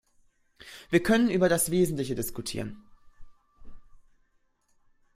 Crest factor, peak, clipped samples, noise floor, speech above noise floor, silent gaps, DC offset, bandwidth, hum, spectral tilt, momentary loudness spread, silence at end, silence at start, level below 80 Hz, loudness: 22 dB; -8 dBFS; under 0.1%; -69 dBFS; 43 dB; none; under 0.1%; 16 kHz; none; -5 dB/octave; 17 LU; 1.15 s; 0.65 s; -54 dBFS; -26 LUFS